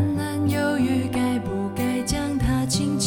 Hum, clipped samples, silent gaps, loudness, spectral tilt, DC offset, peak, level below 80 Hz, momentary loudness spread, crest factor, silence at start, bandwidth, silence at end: none; under 0.1%; none; -23 LUFS; -5 dB/octave; under 0.1%; -10 dBFS; -38 dBFS; 3 LU; 12 dB; 0 s; 17.5 kHz; 0 s